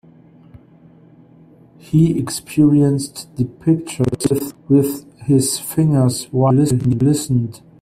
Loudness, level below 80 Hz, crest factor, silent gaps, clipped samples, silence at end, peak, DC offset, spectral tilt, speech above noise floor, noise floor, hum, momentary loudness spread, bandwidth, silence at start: -17 LUFS; -48 dBFS; 14 dB; none; under 0.1%; 0.25 s; -2 dBFS; under 0.1%; -6.5 dB/octave; 30 dB; -46 dBFS; none; 9 LU; 16 kHz; 1.9 s